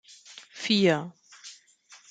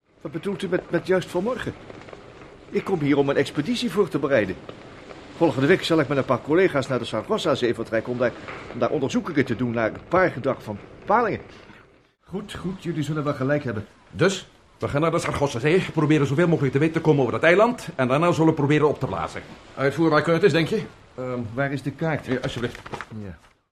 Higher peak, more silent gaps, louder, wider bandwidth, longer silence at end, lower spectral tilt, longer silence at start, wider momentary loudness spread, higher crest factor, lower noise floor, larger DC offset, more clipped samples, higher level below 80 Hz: second, -10 dBFS vs -4 dBFS; neither; about the same, -25 LUFS vs -23 LUFS; second, 9.4 kHz vs 13.5 kHz; second, 0.15 s vs 0.35 s; second, -5 dB/octave vs -6.5 dB/octave; about the same, 0.3 s vs 0.25 s; first, 24 LU vs 16 LU; about the same, 20 dB vs 18 dB; about the same, -56 dBFS vs -55 dBFS; neither; neither; second, -72 dBFS vs -54 dBFS